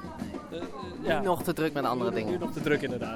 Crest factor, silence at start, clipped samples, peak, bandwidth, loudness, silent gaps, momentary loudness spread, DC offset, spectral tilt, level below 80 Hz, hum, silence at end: 16 dB; 0 s; under 0.1%; -14 dBFS; 18 kHz; -30 LUFS; none; 11 LU; under 0.1%; -6 dB/octave; -56 dBFS; none; 0 s